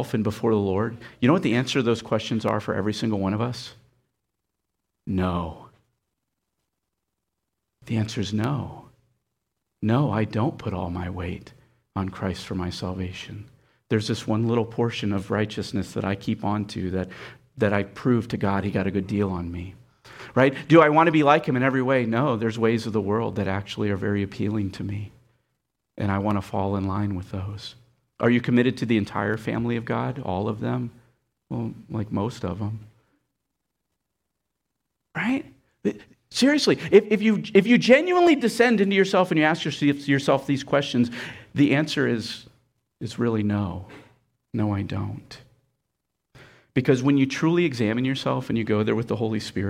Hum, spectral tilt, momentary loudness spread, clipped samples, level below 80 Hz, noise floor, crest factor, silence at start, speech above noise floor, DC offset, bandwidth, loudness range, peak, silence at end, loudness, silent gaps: none; -6.5 dB/octave; 14 LU; under 0.1%; -56 dBFS; -81 dBFS; 20 dB; 0 s; 58 dB; under 0.1%; 14.5 kHz; 13 LU; -4 dBFS; 0 s; -24 LUFS; none